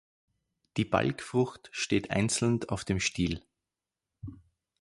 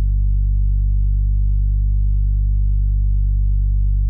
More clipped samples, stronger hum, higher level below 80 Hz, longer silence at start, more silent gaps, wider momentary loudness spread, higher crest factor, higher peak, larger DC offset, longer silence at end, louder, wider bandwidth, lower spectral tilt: neither; second, none vs 50 Hz at -20 dBFS; second, -52 dBFS vs -16 dBFS; first, 0.75 s vs 0 s; neither; first, 17 LU vs 0 LU; first, 22 dB vs 4 dB; about the same, -10 dBFS vs -10 dBFS; neither; first, 0.45 s vs 0 s; second, -30 LUFS vs -20 LUFS; first, 11.5 kHz vs 0.3 kHz; second, -4.5 dB/octave vs -28 dB/octave